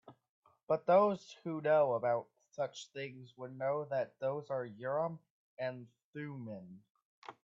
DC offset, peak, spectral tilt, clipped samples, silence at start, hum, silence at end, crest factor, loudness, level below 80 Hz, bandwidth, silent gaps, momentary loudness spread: under 0.1%; -16 dBFS; -6.5 dB/octave; under 0.1%; 0.1 s; none; 0.1 s; 20 dB; -36 LUFS; -84 dBFS; 7.6 kHz; 0.29-0.42 s, 0.63-0.67 s, 5.30-5.57 s, 6.04-6.13 s, 6.90-6.95 s, 7.05-7.22 s; 21 LU